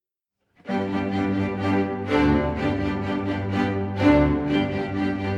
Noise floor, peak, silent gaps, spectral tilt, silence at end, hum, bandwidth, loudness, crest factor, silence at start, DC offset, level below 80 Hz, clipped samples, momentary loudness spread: -79 dBFS; -6 dBFS; none; -8 dB/octave; 0 s; none; 7.8 kHz; -23 LUFS; 16 dB; 0.65 s; under 0.1%; -38 dBFS; under 0.1%; 7 LU